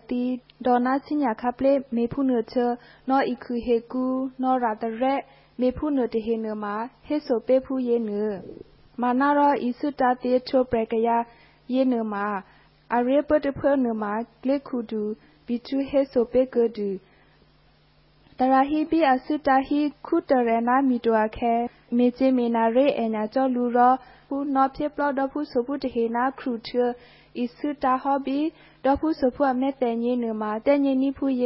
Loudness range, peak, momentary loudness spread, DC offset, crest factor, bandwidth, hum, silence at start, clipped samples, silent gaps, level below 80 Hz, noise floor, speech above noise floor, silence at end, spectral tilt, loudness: 4 LU; -8 dBFS; 9 LU; under 0.1%; 16 dB; 5.8 kHz; none; 0.1 s; under 0.1%; none; -54 dBFS; -59 dBFS; 35 dB; 0 s; -10 dB/octave; -24 LUFS